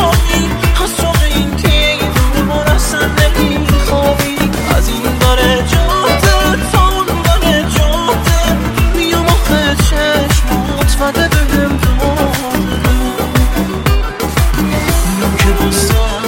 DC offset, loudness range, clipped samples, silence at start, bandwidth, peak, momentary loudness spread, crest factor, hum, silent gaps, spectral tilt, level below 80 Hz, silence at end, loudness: under 0.1%; 2 LU; under 0.1%; 0 s; 17 kHz; 0 dBFS; 3 LU; 10 dB; none; none; -4.5 dB/octave; -16 dBFS; 0 s; -12 LUFS